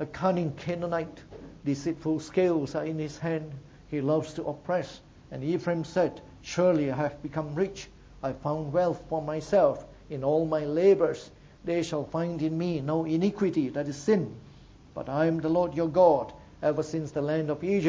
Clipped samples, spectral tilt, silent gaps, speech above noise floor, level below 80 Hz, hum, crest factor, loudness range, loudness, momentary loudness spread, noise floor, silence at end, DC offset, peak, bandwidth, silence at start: under 0.1%; -7 dB/octave; none; 24 dB; -56 dBFS; none; 20 dB; 4 LU; -28 LUFS; 15 LU; -52 dBFS; 0 s; under 0.1%; -8 dBFS; 8 kHz; 0 s